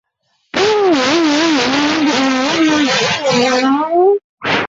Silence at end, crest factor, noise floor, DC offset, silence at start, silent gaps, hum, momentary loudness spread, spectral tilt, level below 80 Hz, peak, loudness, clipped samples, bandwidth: 0 s; 12 dB; -64 dBFS; under 0.1%; 0.55 s; 4.24-4.37 s; none; 2 LU; -3.5 dB/octave; -52 dBFS; -2 dBFS; -13 LUFS; under 0.1%; 8 kHz